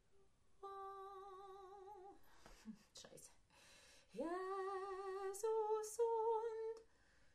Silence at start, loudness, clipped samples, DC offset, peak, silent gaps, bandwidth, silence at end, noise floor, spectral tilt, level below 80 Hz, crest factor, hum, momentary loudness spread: 0.15 s; -45 LUFS; under 0.1%; under 0.1%; -30 dBFS; none; 13 kHz; 0.05 s; -74 dBFS; -3.5 dB/octave; -78 dBFS; 18 dB; none; 23 LU